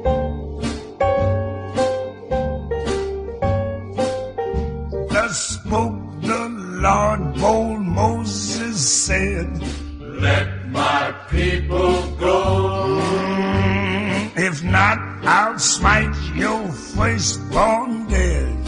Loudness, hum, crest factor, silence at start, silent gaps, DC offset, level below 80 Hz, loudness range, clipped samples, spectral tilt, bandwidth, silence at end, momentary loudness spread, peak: -20 LUFS; none; 18 dB; 0 s; none; under 0.1%; -30 dBFS; 5 LU; under 0.1%; -4.5 dB/octave; 10 kHz; 0 s; 9 LU; -2 dBFS